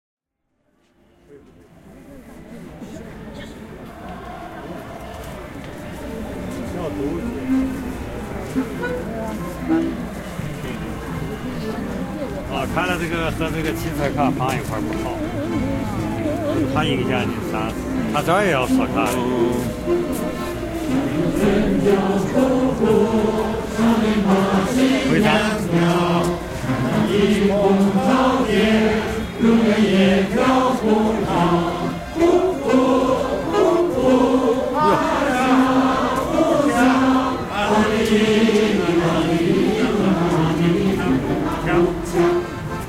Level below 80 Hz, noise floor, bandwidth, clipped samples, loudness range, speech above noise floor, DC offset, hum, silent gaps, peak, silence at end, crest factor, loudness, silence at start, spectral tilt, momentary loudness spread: -38 dBFS; -71 dBFS; 16 kHz; under 0.1%; 12 LU; 53 dB; under 0.1%; none; none; -2 dBFS; 0 s; 18 dB; -19 LUFS; 1.3 s; -6 dB/octave; 13 LU